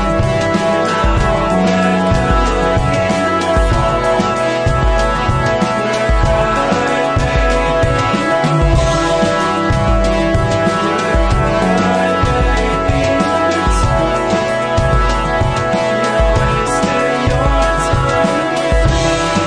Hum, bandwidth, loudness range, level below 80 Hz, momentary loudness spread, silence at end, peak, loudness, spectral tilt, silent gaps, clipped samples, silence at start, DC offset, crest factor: none; 10.5 kHz; 1 LU; -20 dBFS; 2 LU; 0 s; 0 dBFS; -14 LUFS; -5.5 dB/octave; none; under 0.1%; 0 s; under 0.1%; 12 dB